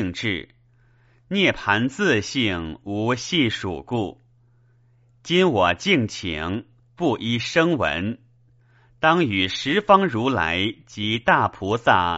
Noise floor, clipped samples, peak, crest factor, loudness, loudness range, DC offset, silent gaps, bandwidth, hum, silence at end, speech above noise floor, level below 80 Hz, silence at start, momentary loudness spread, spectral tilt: -57 dBFS; under 0.1%; -2 dBFS; 22 dB; -21 LUFS; 4 LU; under 0.1%; none; 8 kHz; none; 0 s; 36 dB; -50 dBFS; 0 s; 10 LU; -3 dB/octave